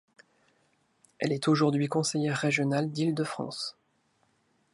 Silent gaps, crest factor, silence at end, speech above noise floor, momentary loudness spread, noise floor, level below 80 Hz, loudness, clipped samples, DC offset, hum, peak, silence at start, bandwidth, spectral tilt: none; 18 dB; 1.05 s; 43 dB; 10 LU; -71 dBFS; -76 dBFS; -29 LUFS; under 0.1%; under 0.1%; none; -12 dBFS; 1.2 s; 11.5 kHz; -5.5 dB/octave